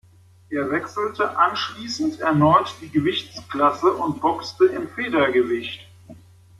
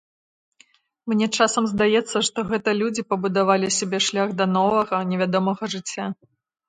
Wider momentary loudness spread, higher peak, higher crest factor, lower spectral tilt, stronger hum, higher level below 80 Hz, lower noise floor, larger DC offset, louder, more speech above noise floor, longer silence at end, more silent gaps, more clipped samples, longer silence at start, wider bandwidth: about the same, 9 LU vs 9 LU; about the same, -4 dBFS vs -4 dBFS; about the same, 18 dB vs 18 dB; first, -6 dB/octave vs -4 dB/octave; neither; about the same, -60 dBFS vs -62 dBFS; second, -46 dBFS vs -58 dBFS; neither; about the same, -21 LUFS vs -22 LUFS; second, 25 dB vs 37 dB; about the same, 0.45 s vs 0.55 s; neither; neither; second, 0.5 s vs 1.05 s; first, 12.5 kHz vs 9.6 kHz